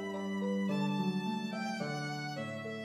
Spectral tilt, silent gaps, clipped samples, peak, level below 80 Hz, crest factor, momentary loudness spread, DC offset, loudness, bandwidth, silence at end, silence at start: -6 dB/octave; none; under 0.1%; -22 dBFS; -84 dBFS; 14 dB; 6 LU; under 0.1%; -36 LUFS; 12.5 kHz; 0 s; 0 s